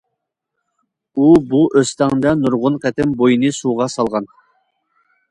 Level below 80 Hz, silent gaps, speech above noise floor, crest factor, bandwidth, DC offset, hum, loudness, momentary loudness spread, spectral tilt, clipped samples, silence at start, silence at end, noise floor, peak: -50 dBFS; none; 62 dB; 16 dB; 11 kHz; under 0.1%; none; -15 LUFS; 8 LU; -6 dB/octave; under 0.1%; 1.15 s; 1.05 s; -77 dBFS; 0 dBFS